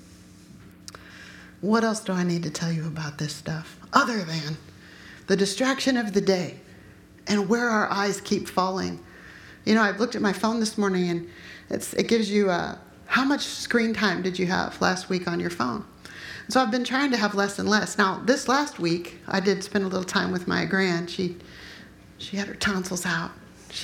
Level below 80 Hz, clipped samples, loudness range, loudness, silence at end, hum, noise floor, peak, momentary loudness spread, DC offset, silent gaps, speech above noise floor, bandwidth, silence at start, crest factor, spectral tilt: -58 dBFS; under 0.1%; 4 LU; -25 LUFS; 0 s; none; -49 dBFS; -2 dBFS; 19 LU; under 0.1%; none; 24 dB; 17 kHz; 0.05 s; 24 dB; -4.5 dB/octave